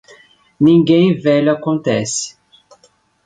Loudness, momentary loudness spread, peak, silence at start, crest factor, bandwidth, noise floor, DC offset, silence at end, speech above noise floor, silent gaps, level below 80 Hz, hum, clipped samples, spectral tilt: -14 LUFS; 10 LU; -2 dBFS; 0.6 s; 14 dB; 9.4 kHz; -55 dBFS; under 0.1%; 0.95 s; 42 dB; none; -56 dBFS; none; under 0.1%; -5.5 dB/octave